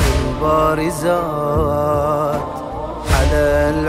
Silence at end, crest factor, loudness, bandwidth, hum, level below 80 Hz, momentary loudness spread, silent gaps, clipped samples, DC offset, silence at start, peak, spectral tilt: 0 s; 14 dB; -17 LUFS; 16 kHz; none; -24 dBFS; 10 LU; none; under 0.1%; under 0.1%; 0 s; -2 dBFS; -6 dB/octave